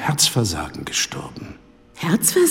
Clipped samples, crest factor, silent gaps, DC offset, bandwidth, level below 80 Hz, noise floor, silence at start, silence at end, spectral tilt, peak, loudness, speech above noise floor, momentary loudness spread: under 0.1%; 18 dB; none; under 0.1%; 16.5 kHz; -46 dBFS; -44 dBFS; 0 s; 0 s; -3.5 dB/octave; -2 dBFS; -20 LUFS; 24 dB; 19 LU